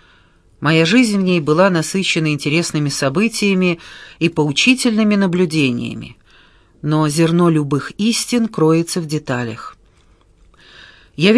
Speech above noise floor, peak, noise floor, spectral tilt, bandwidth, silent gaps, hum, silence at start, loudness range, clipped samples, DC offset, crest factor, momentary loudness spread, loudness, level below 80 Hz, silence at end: 36 dB; 0 dBFS; -51 dBFS; -5 dB/octave; 11 kHz; none; none; 0.6 s; 4 LU; under 0.1%; under 0.1%; 16 dB; 13 LU; -16 LUFS; -52 dBFS; 0 s